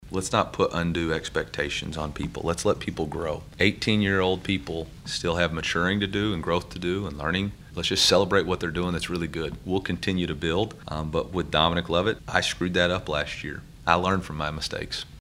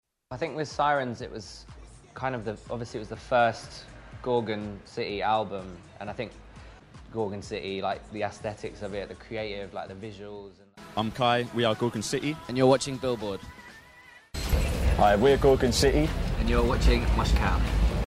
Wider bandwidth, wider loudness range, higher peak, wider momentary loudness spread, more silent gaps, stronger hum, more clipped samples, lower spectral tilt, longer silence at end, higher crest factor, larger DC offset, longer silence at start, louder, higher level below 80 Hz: about the same, 16 kHz vs 15.5 kHz; second, 3 LU vs 11 LU; first, 0 dBFS vs -8 dBFS; second, 9 LU vs 18 LU; neither; neither; neither; about the same, -4.5 dB/octave vs -5.5 dB/octave; about the same, 0 s vs 0 s; first, 26 dB vs 20 dB; neither; second, 0 s vs 0.3 s; about the same, -26 LUFS vs -28 LUFS; second, -44 dBFS vs -34 dBFS